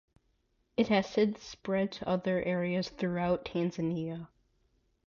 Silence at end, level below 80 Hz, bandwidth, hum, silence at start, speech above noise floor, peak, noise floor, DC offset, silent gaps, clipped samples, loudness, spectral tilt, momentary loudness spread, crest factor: 0.8 s; -62 dBFS; 7.2 kHz; none; 0.8 s; 43 dB; -16 dBFS; -74 dBFS; under 0.1%; none; under 0.1%; -32 LUFS; -7 dB/octave; 9 LU; 18 dB